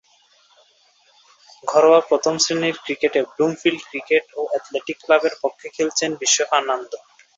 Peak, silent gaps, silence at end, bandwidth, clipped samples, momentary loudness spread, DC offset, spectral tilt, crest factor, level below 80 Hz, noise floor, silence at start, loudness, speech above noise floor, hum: -2 dBFS; none; 0.4 s; 8 kHz; under 0.1%; 12 LU; under 0.1%; -2 dB/octave; 20 dB; -70 dBFS; -58 dBFS; 1.65 s; -19 LUFS; 38 dB; none